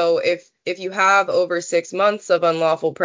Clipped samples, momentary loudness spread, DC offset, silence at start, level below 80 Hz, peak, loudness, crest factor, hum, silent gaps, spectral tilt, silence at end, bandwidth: under 0.1%; 10 LU; under 0.1%; 0 s; -72 dBFS; -4 dBFS; -19 LUFS; 14 dB; none; none; -3.5 dB/octave; 0 s; 7.6 kHz